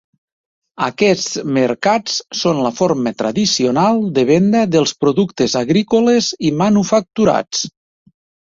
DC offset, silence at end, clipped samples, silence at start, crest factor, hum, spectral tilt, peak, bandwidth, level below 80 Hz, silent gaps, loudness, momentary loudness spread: under 0.1%; 0.75 s; under 0.1%; 0.8 s; 14 dB; none; -5 dB/octave; -2 dBFS; 7.8 kHz; -54 dBFS; none; -15 LUFS; 5 LU